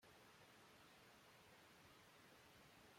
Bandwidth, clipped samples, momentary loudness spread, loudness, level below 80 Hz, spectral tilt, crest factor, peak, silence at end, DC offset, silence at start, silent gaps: 16.5 kHz; under 0.1%; 0 LU; -67 LUFS; -88 dBFS; -3 dB/octave; 12 dB; -56 dBFS; 0 s; under 0.1%; 0 s; none